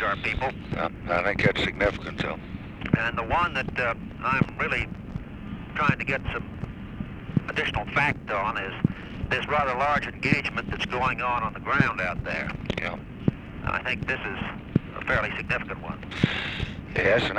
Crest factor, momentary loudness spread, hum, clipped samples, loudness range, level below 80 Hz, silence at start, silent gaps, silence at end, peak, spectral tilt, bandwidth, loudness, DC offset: 24 dB; 11 LU; none; under 0.1%; 3 LU; -42 dBFS; 0 s; none; 0 s; -4 dBFS; -6.5 dB/octave; 11 kHz; -27 LUFS; under 0.1%